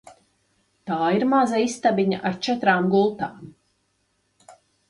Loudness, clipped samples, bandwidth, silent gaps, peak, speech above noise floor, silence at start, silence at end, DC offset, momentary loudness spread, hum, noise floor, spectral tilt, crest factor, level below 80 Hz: -22 LUFS; under 0.1%; 11.5 kHz; none; -6 dBFS; 49 dB; 0.85 s; 0.4 s; under 0.1%; 11 LU; none; -70 dBFS; -5.5 dB/octave; 18 dB; -66 dBFS